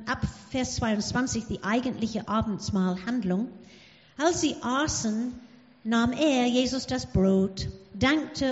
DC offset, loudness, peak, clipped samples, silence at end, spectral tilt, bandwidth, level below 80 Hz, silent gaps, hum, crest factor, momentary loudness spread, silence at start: under 0.1%; -27 LUFS; -10 dBFS; under 0.1%; 0 s; -4.5 dB/octave; 8 kHz; -48 dBFS; none; none; 18 dB; 8 LU; 0 s